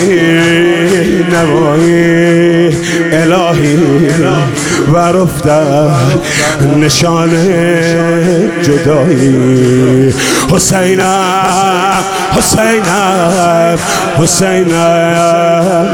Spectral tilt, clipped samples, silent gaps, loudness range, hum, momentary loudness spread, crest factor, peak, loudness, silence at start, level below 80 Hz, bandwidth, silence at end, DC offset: -5 dB/octave; under 0.1%; none; 1 LU; none; 3 LU; 8 dB; 0 dBFS; -8 LUFS; 0 s; -36 dBFS; 17.5 kHz; 0 s; 0.4%